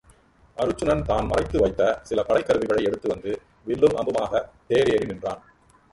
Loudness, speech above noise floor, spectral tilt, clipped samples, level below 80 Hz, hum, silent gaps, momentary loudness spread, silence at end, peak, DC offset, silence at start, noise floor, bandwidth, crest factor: -24 LUFS; 33 dB; -6 dB/octave; under 0.1%; -42 dBFS; none; none; 11 LU; 0.55 s; -6 dBFS; under 0.1%; 0.55 s; -56 dBFS; 11.5 kHz; 18 dB